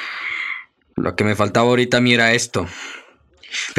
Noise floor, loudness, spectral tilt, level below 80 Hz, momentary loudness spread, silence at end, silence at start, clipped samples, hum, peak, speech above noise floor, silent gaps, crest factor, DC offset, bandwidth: -47 dBFS; -18 LUFS; -4 dB/octave; -56 dBFS; 18 LU; 0 s; 0 s; under 0.1%; none; -2 dBFS; 30 dB; none; 18 dB; under 0.1%; 14 kHz